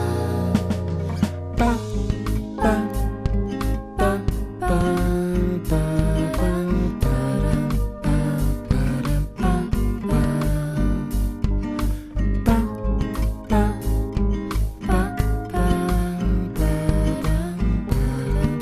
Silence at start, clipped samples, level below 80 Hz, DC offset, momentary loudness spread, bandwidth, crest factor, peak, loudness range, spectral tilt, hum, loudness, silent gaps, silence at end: 0 s; under 0.1%; -24 dBFS; under 0.1%; 4 LU; 14 kHz; 18 dB; -2 dBFS; 1 LU; -7.5 dB/octave; none; -23 LUFS; none; 0 s